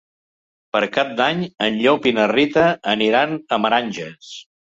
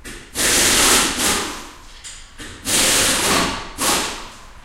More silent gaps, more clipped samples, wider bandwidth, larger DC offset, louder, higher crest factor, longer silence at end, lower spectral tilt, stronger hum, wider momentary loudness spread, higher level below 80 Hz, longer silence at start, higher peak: neither; neither; second, 7.8 kHz vs 16 kHz; neither; second, -18 LUFS vs -15 LUFS; about the same, 16 dB vs 18 dB; first, 0.25 s vs 0.05 s; first, -5 dB/octave vs -1 dB/octave; neither; second, 12 LU vs 23 LU; second, -58 dBFS vs -38 dBFS; first, 0.75 s vs 0.05 s; about the same, -2 dBFS vs -2 dBFS